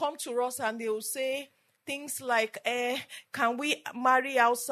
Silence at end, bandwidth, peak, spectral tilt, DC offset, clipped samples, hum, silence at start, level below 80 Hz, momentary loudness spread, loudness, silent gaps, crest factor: 0 s; 13.5 kHz; -10 dBFS; -1.5 dB/octave; under 0.1%; under 0.1%; none; 0 s; -88 dBFS; 12 LU; -30 LUFS; none; 20 dB